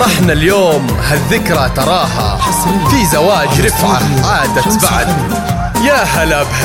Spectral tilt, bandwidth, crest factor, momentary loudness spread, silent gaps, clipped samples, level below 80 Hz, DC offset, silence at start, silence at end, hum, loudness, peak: -4.5 dB/octave; 17 kHz; 10 dB; 4 LU; none; under 0.1%; -24 dBFS; under 0.1%; 0 s; 0 s; none; -11 LUFS; 0 dBFS